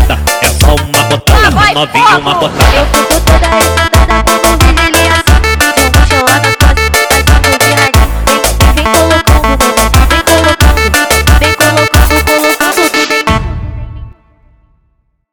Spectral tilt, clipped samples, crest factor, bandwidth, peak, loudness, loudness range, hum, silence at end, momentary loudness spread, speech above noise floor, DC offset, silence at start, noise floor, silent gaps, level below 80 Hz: -4 dB/octave; 0.9%; 8 dB; 19.5 kHz; 0 dBFS; -7 LUFS; 2 LU; none; 1.2 s; 3 LU; 49 dB; under 0.1%; 0 s; -56 dBFS; none; -12 dBFS